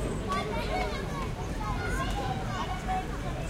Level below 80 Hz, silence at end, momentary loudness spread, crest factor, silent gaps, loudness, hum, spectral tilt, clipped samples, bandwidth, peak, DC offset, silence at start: -38 dBFS; 0 s; 4 LU; 14 dB; none; -33 LUFS; none; -5.5 dB/octave; under 0.1%; 16 kHz; -16 dBFS; under 0.1%; 0 s